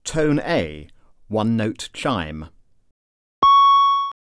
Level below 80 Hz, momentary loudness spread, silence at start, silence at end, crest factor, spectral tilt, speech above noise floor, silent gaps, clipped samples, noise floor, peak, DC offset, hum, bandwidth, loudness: -44 dBFS; 15 LU; 0.05 s; 0.2 s; 16 dB; -5 dB/octave; over 68 dB; 2.91-3.42 s; under 0.1%; under -90 dBFS; -4 dBFS; 0.2%; none; 11 kHz; -18 LUFS